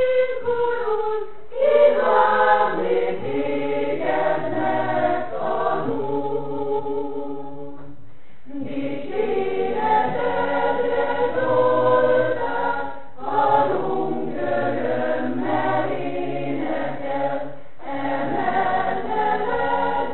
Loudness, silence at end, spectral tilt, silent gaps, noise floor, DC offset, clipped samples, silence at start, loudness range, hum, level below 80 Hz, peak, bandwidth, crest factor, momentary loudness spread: -22 LUFS; 0 s; -10.5 dB/octave; none; -50 dBFS; 4%; under 0.1%; 0 s; 7 LU; none; -56 dBFS; -4 dBFS; 4.2 kHz; 18 dB; 11 LU